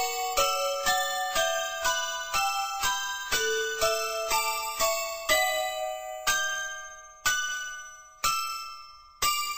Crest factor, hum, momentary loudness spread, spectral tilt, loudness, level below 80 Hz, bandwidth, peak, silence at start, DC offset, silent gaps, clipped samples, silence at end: 18 dB; none; 9 LU; 1 dB/octave; -27 LUFS; -54 dBFS; 16 kHz; -10 dBFS; 0 s; under 0.1%; none; under 0.1%; 0 s